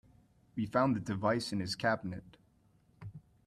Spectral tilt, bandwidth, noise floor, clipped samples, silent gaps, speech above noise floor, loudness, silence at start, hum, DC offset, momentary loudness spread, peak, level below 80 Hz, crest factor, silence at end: -6 dB/octave; 13.5 kHz; -68 dBFS; under 0.1%; none; 35 dB; -34 LUFS; 0.55 s; none; under 0.1%; 20 LU; -16 dBFS; -66 dBFS; 20 dB; 0.25 s